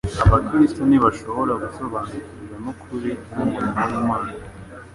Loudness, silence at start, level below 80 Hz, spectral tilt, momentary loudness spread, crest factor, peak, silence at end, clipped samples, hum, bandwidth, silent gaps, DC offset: -21 LUFS; 0.05 s; -34 dBFS; -8 dB/octave; 17 LU; 18 dB; -2 dBFS; 0 s; under 0.1%; none; 11.5 kHz; none; under 0.1%